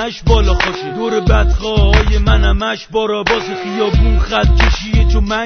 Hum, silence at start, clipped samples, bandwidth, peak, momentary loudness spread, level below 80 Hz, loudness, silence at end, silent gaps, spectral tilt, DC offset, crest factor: none; 0 s; under 0.1%; 6.6 kHz; 0 dBFS; 6 LU; -14 dBFS; -14 LUFS; 0 s; none; -6 dB/octave; under 0.1%; 12 dB